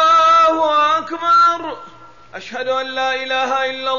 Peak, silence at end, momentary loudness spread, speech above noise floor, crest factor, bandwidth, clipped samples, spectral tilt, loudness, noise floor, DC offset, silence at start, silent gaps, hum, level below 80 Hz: -6 dBFS; 0 s; 18 LU; 21 dB; 10 dB; 7.4 kHz; under 0.1%; -2 dB/octave; -15 LUFS; -41 dBFS; 0.5%; 0 s; none; none; -56 dBFS